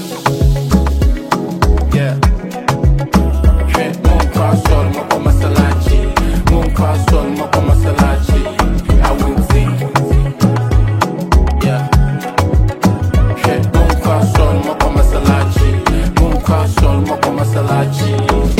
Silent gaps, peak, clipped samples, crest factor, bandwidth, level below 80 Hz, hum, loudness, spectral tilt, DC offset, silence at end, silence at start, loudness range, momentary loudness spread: none; 0 dBFS; under 0.1%; 12 dB; 16 kHz; -16 dBFS; none; -13 LUFS; -6.5 dB/octave; under 0.1%; 0 s; 0 s; 1 LU; 3 LU